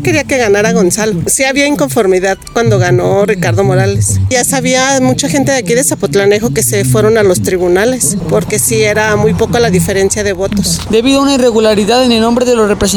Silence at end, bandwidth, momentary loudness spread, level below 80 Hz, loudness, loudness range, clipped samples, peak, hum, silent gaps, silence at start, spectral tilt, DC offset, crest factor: 0 s; 19.5 kHz; 3 LU; -34 dBFS; -10 LUFS; 1 LU; under 0.1%; 0 dBFS; none; none; 0 s; -4.5 dB/octave; under 0.1%; 10 dB